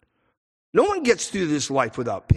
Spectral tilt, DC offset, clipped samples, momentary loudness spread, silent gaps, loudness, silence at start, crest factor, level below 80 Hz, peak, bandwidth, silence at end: -5 dB/octave; under 0.1%; under 0.1%; 5 LU; none; -23 LUFS; 0.75 s; 18 dB; -38 dBFS; -6 dBFS; 12 kHz; 0 s